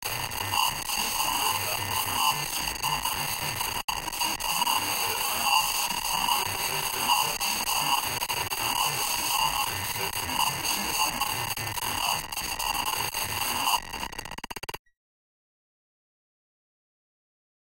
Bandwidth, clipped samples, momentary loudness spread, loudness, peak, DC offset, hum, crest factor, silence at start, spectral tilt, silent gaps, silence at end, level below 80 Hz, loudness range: 17 kHz; under 0.1%; 5 LU; -26 LUFS; -8 dBFS; under 0.1%; none; 22 dB; 0 s; -0.5 dB/octave; 3.84-3.88 s; 2.85 s; -50 dBFS; 7 LU